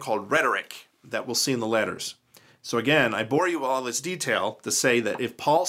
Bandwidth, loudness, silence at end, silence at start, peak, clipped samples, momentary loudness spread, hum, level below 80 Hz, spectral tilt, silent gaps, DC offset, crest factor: 16 kHz; -25 LUFS; 0 s; 0 s; -8 dBFS; under 0.1%; 12 LU; none; -74 dBFS; -3 dB/octave; none; under 0.1%; 18 dB